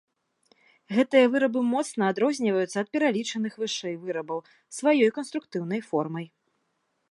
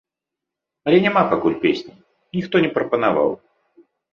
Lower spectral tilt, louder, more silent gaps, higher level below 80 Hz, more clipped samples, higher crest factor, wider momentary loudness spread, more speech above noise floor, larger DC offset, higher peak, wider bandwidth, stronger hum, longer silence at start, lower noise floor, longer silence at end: second, -5 dB/octave vs -7.5 dB/octave; second, -26 LUFS vs -19 LUFS; neither; second, -82 dBFS vs -58 dBFS; neither; about the same, 20 dB vs 18 dB; about the same, 12 LU vs 12 LU; second, 50 dB vs 67 dB; neither; second, -6 dBFS vs -2 dBFS; first, 11.5 kHz vs 6.8 kHz; neither; about the same, 0.9 s vs 0.85 s; second, -75 dBFS vs -85 dBFS; about the same, 0.85 s vs 0.8 s